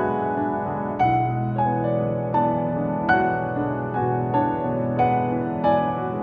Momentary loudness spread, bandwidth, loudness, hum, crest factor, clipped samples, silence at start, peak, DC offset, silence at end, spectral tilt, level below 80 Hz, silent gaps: 5 LU; 4.9 kHz; -23 LUFS; none; 16 dB; under 0.1%; 0 s; -6 dBFS; under 0.1%; 0 s; -10 dB/octave; -50 dBFS; none